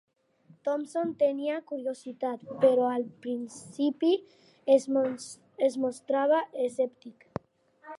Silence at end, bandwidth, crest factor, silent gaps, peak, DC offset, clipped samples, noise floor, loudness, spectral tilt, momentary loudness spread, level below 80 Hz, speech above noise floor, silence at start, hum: 0 s; 11.5 kHz; 18 dB; none; -10 dBFS; under 0.1%; under 0.1%; -60 dBFS; -29 LUFS; -5 dB/octave; 14 LU; -74 dBFS; 32 dB; 0.65 s; none